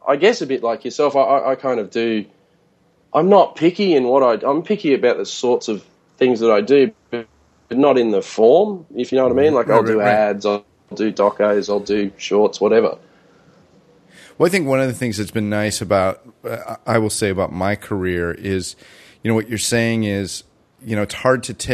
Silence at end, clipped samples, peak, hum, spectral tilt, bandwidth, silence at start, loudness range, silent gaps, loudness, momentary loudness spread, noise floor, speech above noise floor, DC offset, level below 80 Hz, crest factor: 0 s; under 0.1%; 0 dBFS; none; -5 dB/octave; 13.5 kHz; 0.05 s; 5 LU; none; -17 LUFS; 11 LU; -58 dBFS; 41 dB; under 0.1%; -54 dBFS; 18 dB